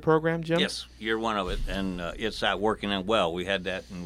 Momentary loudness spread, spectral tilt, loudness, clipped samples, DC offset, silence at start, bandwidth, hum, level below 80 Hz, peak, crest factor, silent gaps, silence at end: 7 LU; -5 dB/octave; -28 LUFS; under 0.1%; under 0.1%; 0 s; 15 kHz; none; -42 dBFS; -8 dBFS; 20 dB; none; 0 s